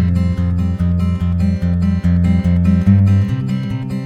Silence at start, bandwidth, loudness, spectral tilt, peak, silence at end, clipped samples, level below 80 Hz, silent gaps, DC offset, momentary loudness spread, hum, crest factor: 0 s; 6.4 kHz; -15 LUFS; -9.5 dB/octave; 0 dBFS; 0 s; under 0.1%; -28 dBFS; none; under 0.1%; 7 LU; none; 14 dB